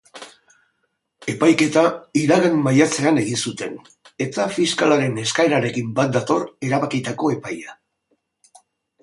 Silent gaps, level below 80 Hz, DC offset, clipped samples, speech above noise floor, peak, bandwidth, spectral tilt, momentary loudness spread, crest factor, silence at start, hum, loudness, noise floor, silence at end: none; -62 dBFS; under 0.1%; under 0.1%; 53 dB; -2 dBFS; 11.5 kHz; -5 dB/octave; 15 LU; 18 dB; 0.15 s; none; -19 LUFS; -72 dBFS; 1.3 s